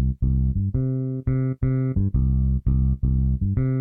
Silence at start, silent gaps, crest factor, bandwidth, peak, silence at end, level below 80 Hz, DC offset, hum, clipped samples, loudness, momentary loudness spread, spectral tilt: 0 s; none; 12 dB; 2.4 kHz; -10 dBFS; 0 s; -26 dBFS; under 0.1%; none; under 0.1%; -23 LUFS; 2 LU; -14.5 dB/octave